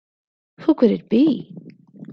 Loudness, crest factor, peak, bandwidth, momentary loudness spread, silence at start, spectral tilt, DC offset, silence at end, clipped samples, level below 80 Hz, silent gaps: -19 LUFS; 18 dB; -4 dBFS; 5.6 kHz; 10 LU; 0.6 s; -9.5 dB/octave; under 0.1%; 0 s; under 0.1%; -62 dBFS; none